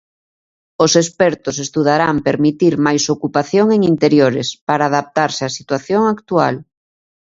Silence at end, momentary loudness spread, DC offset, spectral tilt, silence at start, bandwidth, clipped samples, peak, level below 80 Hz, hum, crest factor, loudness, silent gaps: 0.65 s; 8 LU; under 0.1%; -5 dB/octave; 0.8 s; 8 kHz; under 0.1%; 0 dBFS; -54 dBFS; none; 16 dB; -15 LUFS; 4.61-4.67 s